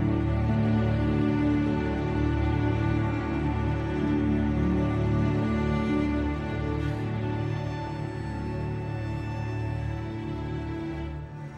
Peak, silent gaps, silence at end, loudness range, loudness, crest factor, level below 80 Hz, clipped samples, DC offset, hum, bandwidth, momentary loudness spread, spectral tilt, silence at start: -14 dBFS; none; 0 s; 6 LU; -28 LUFS; 12 dB; -36 dBFS; under 0.1%; under 0.1%; none; 8 kHz; 8 LU; -8.5 dB/octave; 0 s